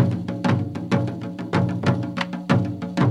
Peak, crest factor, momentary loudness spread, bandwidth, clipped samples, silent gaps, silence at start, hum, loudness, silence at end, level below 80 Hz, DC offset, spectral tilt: -6 dBFS; 16 dB; 5 LU; 10.5 kHz; under 0.1%; none; 0 s; none; -24 LUFS; 0 s; -56 dBFS; under 0.1%; -7.5 dB/octave